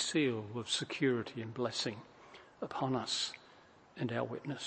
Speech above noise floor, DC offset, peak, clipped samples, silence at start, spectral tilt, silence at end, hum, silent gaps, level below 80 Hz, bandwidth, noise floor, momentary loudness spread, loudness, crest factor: 25 dB; under 0.1%; -20 dBFS; under 0.1%; 0 s; -4 dB/octave; 0 s; none; none; -76 dBFS; 8.8 kHz; -61 dBFS; 19 LU; -37 LUFS; 18 dB